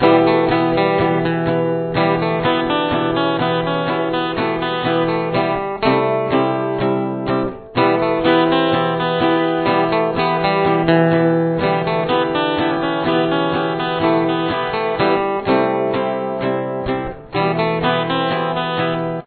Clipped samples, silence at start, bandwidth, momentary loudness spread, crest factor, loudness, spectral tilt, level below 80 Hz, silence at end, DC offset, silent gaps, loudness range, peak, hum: under 0.1%; 0 s; 4.5 kHz; 5 LU; 16 dB; -17 LUFS; -9.5 dB/octave; -46 dBFS; 0.05 s; under 0.1%; none; 3 LU; 0 dBFS; none